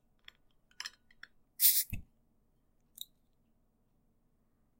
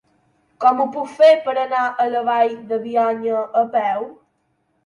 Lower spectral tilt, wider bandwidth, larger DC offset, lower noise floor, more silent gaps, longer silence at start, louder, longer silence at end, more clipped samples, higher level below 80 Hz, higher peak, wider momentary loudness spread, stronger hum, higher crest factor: second, 0.5 dB/octave vs -5 dB/octave; first, 16 kHz vs 10.5 kHz; neither; first, -73 dBFS vs -67 dBFS; neither; first, 0.8 s vs 0.6 s; second, -27 LUFS vs -18 LUFS; first, 2.75 s vs 0.75 s; neither; first, -60 dBFS vs -72 dBFS; second, -10 dBFS vs -4 dBFS; first, 24 LU vs 10 LU; neither; first, 30 dB vs 16 dB